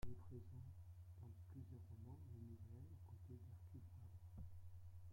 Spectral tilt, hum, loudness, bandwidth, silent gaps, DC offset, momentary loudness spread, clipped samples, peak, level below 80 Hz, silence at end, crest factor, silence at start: -8.5 dB/octave; none; -60 LUFS; 16.5 kHz; none; under 0.1%; 3 LU; under 0.1%; -36 dBFS; -68 dBFS; 0 s; 20 dB; 0 s